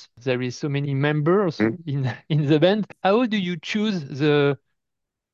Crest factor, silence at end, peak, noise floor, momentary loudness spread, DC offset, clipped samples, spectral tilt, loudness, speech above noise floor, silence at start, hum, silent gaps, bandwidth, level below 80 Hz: 18 dB; 0.75 s; -4 dBFS; -82 dBFS; 8 LU; under 0.1%; under 0.1%; -7 dB/octave; -22 LUFS; 61 dB; 0 s; none; none; 7.2 kHz; -66 dBFS